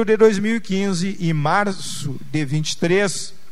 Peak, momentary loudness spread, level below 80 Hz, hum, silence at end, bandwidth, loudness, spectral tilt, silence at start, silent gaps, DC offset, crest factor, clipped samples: -2 dBFS; 12 LU; -56 dBFS; none; 0.2 s; 14 kHz; -20 LUFS; -5 dB/octave; 0 s; none; 4%; 16 dB; under 0.1%